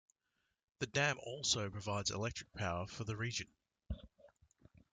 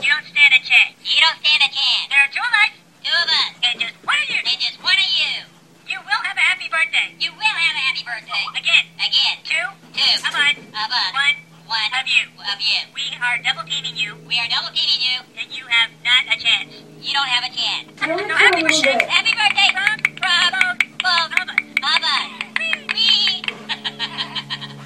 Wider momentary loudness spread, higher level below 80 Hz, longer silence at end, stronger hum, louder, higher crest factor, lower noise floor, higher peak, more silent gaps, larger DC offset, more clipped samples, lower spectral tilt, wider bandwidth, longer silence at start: first, 15 LU vs 11 LU; first, -60 dBFS vs -72 dBFS; first, 0.65 s vs 0 s; neither; second, -39 LUFS vs -16 LUFS; about the same, 22 dB vs 20 dB; first, -85 dBFS vs -42 dBFS; second, -20 dBFS vs 0 dBFS; neither; neither; neither; first, -3 dB/octave vs -0.5 dB/octave; second, 9.6 kHz vs 15 kHz; first, 0.8 s vs 0 s